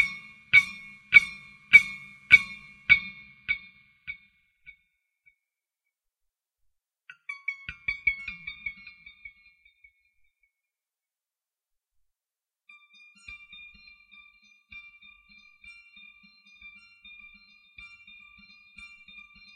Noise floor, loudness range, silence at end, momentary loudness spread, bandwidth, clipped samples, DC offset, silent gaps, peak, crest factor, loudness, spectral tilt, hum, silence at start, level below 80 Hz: under -90 dBFS; 28 LU; 6.2 s; 29 LU; 13.5 kHz; under 0.1%; under 0.1%; none; -2 dBFS; 30 dB; -22 LUFS; -1 dB/octave; none; 0 s; -62 dBFS